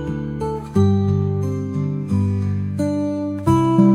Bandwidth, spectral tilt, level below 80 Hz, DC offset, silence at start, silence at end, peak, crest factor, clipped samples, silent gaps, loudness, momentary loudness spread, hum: 11.5 kHz; -9 dB/octave; -44 dBFS; under 0.1%; 0 s; 0 s; -4 dBFS; 16 dB; under 0.1%; none; -20 LUFS; 8 LU; none